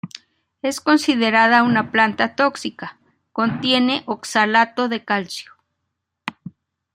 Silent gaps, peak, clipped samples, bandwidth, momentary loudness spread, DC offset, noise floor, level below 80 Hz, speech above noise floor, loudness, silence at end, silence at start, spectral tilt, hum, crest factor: none; -2 dBFS; under 0.1%; 15.5 kHz; 18 LU; under 0.1%; -77 dBFS; -66 dBFS; 59 dB; -18 LUFS; 0.45 s; 0.05 s; -4 dB/octave; none; 18 dB